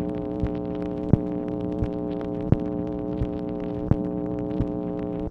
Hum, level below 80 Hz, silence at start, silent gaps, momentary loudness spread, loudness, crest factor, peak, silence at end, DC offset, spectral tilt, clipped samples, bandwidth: none; -38 dBFS; 0 s; none; 6 LU; -28 LUFS; 24 dB; -2 dBFS; 0 s; under 0.1%; -11 dB/octave; under 0.1%; 5.6 kHz